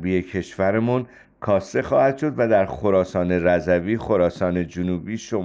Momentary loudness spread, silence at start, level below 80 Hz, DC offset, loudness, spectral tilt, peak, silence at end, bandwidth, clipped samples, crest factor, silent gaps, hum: 7 LU; 0 s; -48 dBFS; under 0.1%; -21 LUFS; -7.5 dB/octave; -6 dBFS; 0 s; 7.8 kHz; under 0.1%; 14 dB; none; none